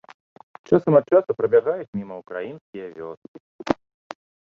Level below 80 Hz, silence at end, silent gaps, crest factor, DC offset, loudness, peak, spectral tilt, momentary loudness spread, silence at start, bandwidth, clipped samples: -60 dBFS; 0.75 s; 1.88-1.93 s, 2.61-2.73 s, 3.17-3.22 s, 3.28-3.34 s, 3.40-3.59 s; 22 dB; under 0.1%; -21 LUFS; -2 dBFS; -8.5 dB/octave; 23 LU; 0.7 s; 7 kHz; under 0.1%